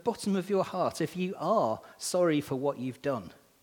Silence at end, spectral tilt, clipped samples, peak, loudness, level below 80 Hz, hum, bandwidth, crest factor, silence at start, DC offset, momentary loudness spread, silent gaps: 0.3 s; -5.5 dB/octave; under 0.1%; -14 dBFS; -31 LUFS; -70 dBFS; none; 19 kHz; 16 dB; 0.05 s; under 0.1%; 7 LU; none